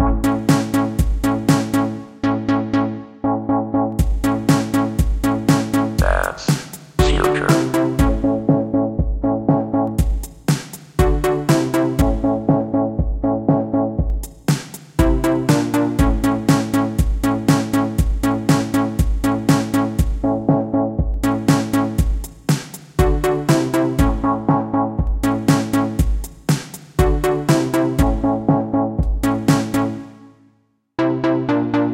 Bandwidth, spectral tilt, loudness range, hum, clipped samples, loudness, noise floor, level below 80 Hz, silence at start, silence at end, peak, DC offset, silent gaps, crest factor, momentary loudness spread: 17 kHz; -6.5 dB/octave; 2 LU; none; under 0.1%; -19 LUFS; -60 dBFS; -24 dBFS; 0 s; 0 s; 0 dBFS; under 0.1%; none; 18 dB; 5 LU